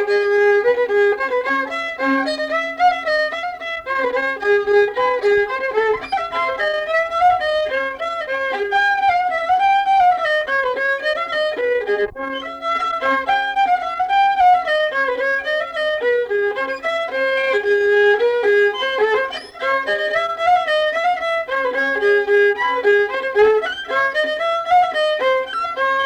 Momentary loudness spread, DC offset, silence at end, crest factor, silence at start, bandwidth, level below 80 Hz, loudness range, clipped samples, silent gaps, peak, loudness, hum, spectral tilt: 6 LU; under 0.1%; 0 s; 12 dB; 0 s; 11 kHz; -54 dBFS; 2 LU; under 0.1%; none; -6 dBFS; -18 LUFS; none; -3 dB/octave